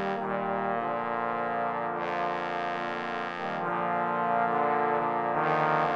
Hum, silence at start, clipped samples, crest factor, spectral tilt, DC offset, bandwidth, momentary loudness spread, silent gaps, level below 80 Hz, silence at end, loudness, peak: none; 0 s; under 0.1%; 16 dB; -7 dB/octave; under 0.1%; 7.8 kHz; 6 LU; none; -74 dBFS; 0 s; -29 LUFS; -12 dBFS